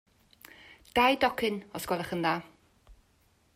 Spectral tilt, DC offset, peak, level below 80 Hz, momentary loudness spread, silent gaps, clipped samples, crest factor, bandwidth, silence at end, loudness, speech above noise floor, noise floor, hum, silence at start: -4.5 dB/octave; under 0.1%; -12 dBFS; -60 dBFS; 14 LU; none; under 0.1%; 20 dB; 16 kHz; 0.6 s; -29 LUFS; 39 dB; -67 dBFS; none; 0.7 s